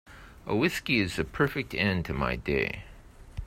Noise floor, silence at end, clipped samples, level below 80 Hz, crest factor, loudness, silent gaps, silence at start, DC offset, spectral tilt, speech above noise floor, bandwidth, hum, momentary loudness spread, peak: -49 dBFS; 0 s; under 0.1%; -44 dBFS; 20 dB; -28 LUFS; none; 0.05 s; under 0.1%; -5.5 dB/octave; 20 dB; 16 kHz; none; 9 LU; -10 dBFS